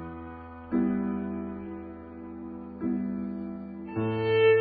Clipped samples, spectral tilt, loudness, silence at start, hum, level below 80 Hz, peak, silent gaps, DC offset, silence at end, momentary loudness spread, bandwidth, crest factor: under 0.1%; -11 dB/octave; -31 LUFS; 0 s; none; -54 dBFS; -12 dBFS; none; under 0.1%; 0 s; 16 LU; 4.7 kHz; 16 dB